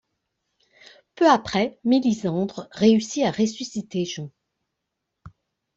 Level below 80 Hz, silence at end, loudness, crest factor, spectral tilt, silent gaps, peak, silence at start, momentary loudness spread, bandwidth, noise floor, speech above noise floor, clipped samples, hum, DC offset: -62 dBFS; 0.45 s; -22 LUFS; 20 dB; -5.5 dB/octave; none; -4 dBFS; 1.2 s; 12 LU; 8 kHz; -81 dBFS; 59 dB; under 0.1%; none; under 0.1%